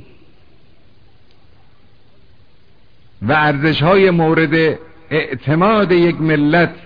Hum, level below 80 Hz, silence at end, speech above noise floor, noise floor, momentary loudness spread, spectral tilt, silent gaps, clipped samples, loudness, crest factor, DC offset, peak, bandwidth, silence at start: none; -46 dBFS; 0.1 s; 39 dB; -52 dBFS; 8 LU; -9 dB/octave; none; under 0.1%; -14 LUFS; 14 dB; 0.9%; -2 dBFS; 5.2 kHz; 3.2 s